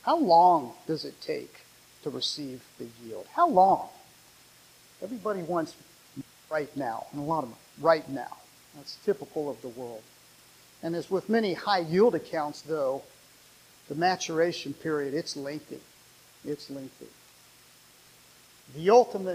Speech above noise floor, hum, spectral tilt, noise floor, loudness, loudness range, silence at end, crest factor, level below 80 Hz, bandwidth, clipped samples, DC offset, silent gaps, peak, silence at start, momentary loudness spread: 29 dB; none; -5 dB/octave; -57 dBFS; -28 LUFS; 8 LU; 0 s; 22 dB; -72 dBFS; 15.5 kHz; under 0.1%; under 0.1%; none; -8 dBFS; 0.05 s; 22 LU